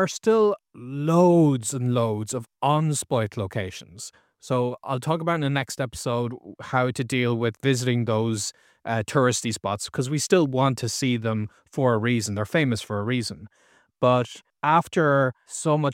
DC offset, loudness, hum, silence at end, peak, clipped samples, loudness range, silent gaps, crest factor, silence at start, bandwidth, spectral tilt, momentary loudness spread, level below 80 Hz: under 0.1%; -24 LUFS; none; 0 s; -6 dBFS; under 0.1%; 4 LU; none; 18 dB; 0 s; 16.5 kHz; -5.5 dB/octave; 11 LU; -62 dBFS